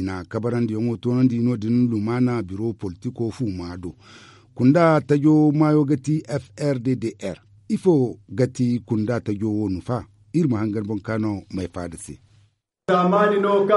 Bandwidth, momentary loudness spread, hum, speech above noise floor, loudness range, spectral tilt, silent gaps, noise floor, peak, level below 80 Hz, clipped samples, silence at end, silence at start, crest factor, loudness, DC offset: 11.5 kHz; 14 LU; none; 40 dB; 6 LU; -8 dB/octave; none; -61 dBFS; -4 dBFS; -56 dBFS; under 0.1%; 0 s; 0 s; 18 dB; -22 LUFS; under 0.1%